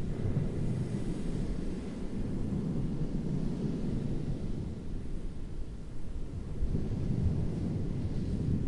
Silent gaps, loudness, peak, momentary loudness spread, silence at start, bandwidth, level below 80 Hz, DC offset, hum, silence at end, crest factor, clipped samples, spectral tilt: none; -36 LUFS; -18 dBFS; 10 LU; 0 s; 11 kHz; -38 dBFS; under 0.1%; none; 0 s; 14 dB; under 0.1%; -8.5 dB/octave